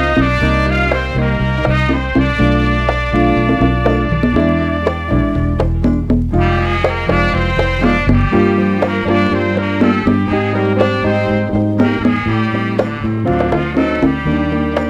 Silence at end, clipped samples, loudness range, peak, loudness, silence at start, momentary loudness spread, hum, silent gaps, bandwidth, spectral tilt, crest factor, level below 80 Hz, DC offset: 0 s; under 0.1%; 1 LU; 0 dBFS; -15 LUFS; 0 s; 3 LU; none; none; 10 kHz; -8 dB/octave; 14 dB; -22 dBFS; under 0.1%